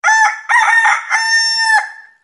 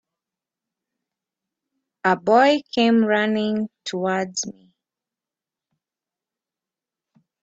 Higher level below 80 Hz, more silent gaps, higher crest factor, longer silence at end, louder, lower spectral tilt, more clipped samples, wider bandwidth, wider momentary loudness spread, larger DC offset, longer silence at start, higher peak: second, -84 dBFS vs -70 dBFS; neither; second, 12 dB vs 20 dB; second, 0.25 s vs 2.9 s; first, -11 LUFS vs -20 LUFS; second, 7 dB/octave vs -4 dB/octave; neither; first, 11.5 kHz vs 8 kHz; second, 4 LU vs 11 LU; neither; second, 0.05 s vs 2.05 s; first, 0 dBFS vs -4 dBFS